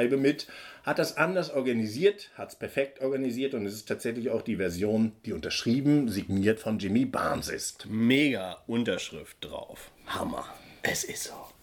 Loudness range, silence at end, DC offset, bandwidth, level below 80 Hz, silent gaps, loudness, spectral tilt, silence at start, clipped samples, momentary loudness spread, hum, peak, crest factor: 4 LU; 0.1 s; under 0.1%; 18.5 kHz; -60 dBFS; none; -29 LUFS; -5 dB/octave; 0 s; under 0.1%; 14 LU; none; -10 dBFS; 20 dB